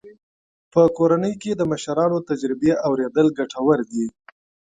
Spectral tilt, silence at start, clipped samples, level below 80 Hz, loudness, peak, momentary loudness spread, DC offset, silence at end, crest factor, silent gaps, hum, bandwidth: -7 dB/octave; 0.05 s; under 0.1%; -58 dBFS; -21 LUFS; -2 dBFS; 7 LU; under 0.1%; 0.6 s; 18 dB; 0.23-0.71 s; none; 9.4 kHz